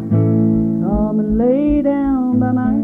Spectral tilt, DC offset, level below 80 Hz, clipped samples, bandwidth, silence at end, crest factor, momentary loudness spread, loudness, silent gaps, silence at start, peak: -12 dB/octave; under 0.1%; -32 dBFS; under 0.1%; 3.5 kHz; 0 s; 10 dB; 3 LU; -16 LUFS; none; 0 s; -4 dBFS